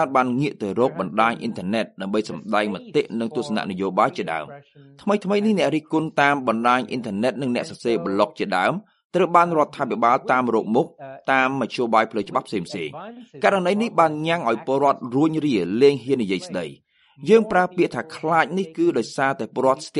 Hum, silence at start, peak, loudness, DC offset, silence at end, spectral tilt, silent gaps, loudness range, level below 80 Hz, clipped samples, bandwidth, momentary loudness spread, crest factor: none; 0 s; -2 dBFS; -21 LUFS; under 0.1%; 0 s; -6 dB/octave; 9.05-9.10 s; 3 LU; -66 dBFS; under 0.1%; 11.5 kHz; 10 LU; 20 dB